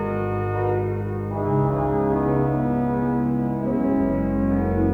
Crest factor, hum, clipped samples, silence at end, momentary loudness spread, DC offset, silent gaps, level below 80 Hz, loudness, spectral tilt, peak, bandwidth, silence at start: 12 dB; 50 Hz at -50 dBFS; under 0.1%; 0 s; 4 LU; under 0.1%; none; -38 dBFS; -23 LUFS; -11 dB/octave; -10 dBFS; 4.1 kHz; 0 s